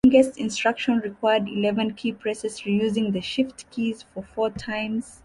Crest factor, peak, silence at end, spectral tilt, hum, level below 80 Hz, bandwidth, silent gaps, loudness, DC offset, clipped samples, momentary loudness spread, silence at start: 18 dB; -6 dBFS; 0.1 s; -5 dB/octave; none; -54 dBFS; 11.5 kHz; none; -25 LUFS; under 0.1%; under 0.1%; 7 LU; 0.05 s